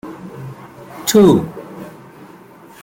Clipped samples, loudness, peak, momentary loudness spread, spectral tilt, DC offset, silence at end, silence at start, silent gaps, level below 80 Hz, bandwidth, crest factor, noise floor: under 0.1%; -13 LUFS; -2 dBFS; 25 LU; -5.5 dB/octave; under 0.1%; 0.95 s; 0.05 s; none; -52 dBFS; 17 kHz; 16 dB; -41 dBFS